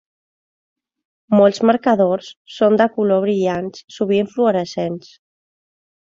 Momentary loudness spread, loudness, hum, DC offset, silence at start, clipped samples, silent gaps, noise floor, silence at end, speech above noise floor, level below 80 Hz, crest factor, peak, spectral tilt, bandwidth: 11 LU; -17 LUFS; none; under 0.1%; 1.3 s; under 0.1%; 2.37-2.45 s, 3.84-3.88 s; under -90 dBFS; 1.15 s; over 73 dB; -60 dBFS; 18 dB; -2 dBFS; -6.5 dB/octave; 7.6 kHz